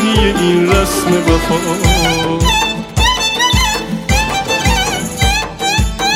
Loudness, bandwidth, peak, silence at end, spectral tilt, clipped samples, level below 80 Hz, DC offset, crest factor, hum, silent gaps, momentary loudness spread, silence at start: -13 LUFS; 16.5 kHz; 0 dBFS; 0 s; -4 dB/octave; under 0.1%; -20 dBFS; under 0.1%; 12 dB; none; none; 4 LU; 0 s